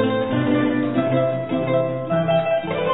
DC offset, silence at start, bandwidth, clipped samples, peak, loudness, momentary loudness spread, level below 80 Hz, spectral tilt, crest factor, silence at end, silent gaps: 0.5%; 0 s; 4.1 kHz; under 0.1%; -8 dBFS; -20 LUFS; 3 LU; -54 dBFS; -11 dB/octave; 12 dB; 0 s; none